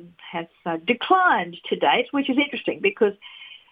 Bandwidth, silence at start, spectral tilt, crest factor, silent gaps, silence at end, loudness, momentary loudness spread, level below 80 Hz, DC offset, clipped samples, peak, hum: 5 kHz; 0 s; -7 dB/octave; 18 dB; none; 0.15 s; -22 LUFS; 16 LU; -70 dBFS; under 0.1%; under 0.1%; -4 dBFS; none